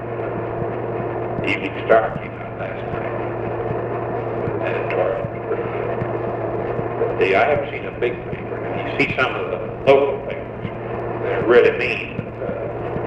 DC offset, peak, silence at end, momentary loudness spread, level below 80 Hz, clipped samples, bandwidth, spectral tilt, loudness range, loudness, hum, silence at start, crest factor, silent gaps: under 0.1%; 0 dBFS; 0 s; 11 LU; -44 dBFS; under 0.1%; 8 kHz; -8 dB/octave; 4 LU; -21 LUFS; none; 0 s; 20 dB; none